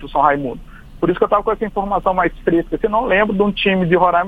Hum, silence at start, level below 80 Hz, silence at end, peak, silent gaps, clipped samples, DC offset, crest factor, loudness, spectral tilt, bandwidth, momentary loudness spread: none; 0 s; -36 dBFS; 0 s; 0 dBFS; none; under 0.1%; under 0.1%; 16 dB; -17 LUFS; -8 dB/octave; 5 kHz; 7 LU